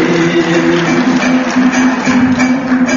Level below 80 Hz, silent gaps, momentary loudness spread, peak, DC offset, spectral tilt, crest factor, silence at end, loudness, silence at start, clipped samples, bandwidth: -44 dBFS; none; 1 LU; 0 dBFS; under 0.1%; -4.5 dB/octave; 10 dB; 0 s; -11 LUFS; 0 s; under 0.1%; 7.6 kHz